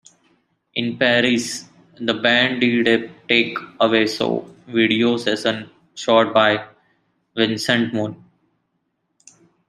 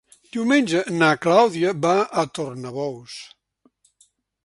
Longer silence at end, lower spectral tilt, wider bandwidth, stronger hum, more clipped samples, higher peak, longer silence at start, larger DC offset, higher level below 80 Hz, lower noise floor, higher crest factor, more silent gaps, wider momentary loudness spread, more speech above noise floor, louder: first, 1.55 s vs 1.2 s; about the same, -4 dB/octave vs -5 dB/octave; first, 13 kHz vs 11.5 kHz; neither; neither; about the same, -2 dBFS vs -2 dBFS; first, 0.75 s vs 0.35 s; neither; about the same, -64 dBFS vs -66 dBFS; first, -72 dBFS vs -63 dBFS; about the same, 20 dB vs 20 dB; neither; second, 12 LU vs 16 LU; first, 53 dB vs 42 dB; about the same, -19 LUFS vs -20 LUFS